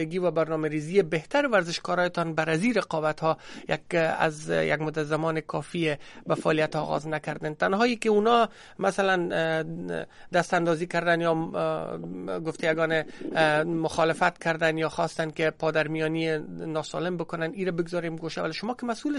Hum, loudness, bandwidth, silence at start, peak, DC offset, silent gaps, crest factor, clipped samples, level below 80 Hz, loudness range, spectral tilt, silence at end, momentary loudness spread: none; -27 LUFS; 11.5 kHz; 0 s; -8 dBFS; under 0.1%; none; 20 dB; under 0.1%; -60 dBFS; 3 LU; -5.5 dB/octave; 0 s; 8 LU